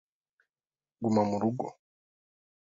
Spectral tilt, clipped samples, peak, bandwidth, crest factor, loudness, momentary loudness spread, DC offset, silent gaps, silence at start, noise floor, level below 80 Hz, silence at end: -8 dB/octave; under 0.1%; -14 dBFS; 7.6 kHz; 20 dB; -30 LUFS; 11 LU; under 0.1%; none; 1 s; under -90 dBFS; -70 dBFS; 0.9 s